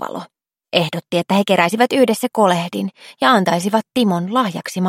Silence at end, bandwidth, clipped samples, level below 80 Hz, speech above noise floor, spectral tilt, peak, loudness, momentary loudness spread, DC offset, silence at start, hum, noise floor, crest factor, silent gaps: 0 s; 16.5 kHz; under 0.1%; -66 dBFS; 32 dB; -5 dB/octave; 0 dBFS; -17 LUFS; 9 LU; under 0.1%; 0 s; none; -48 dBFS; 18 dB; none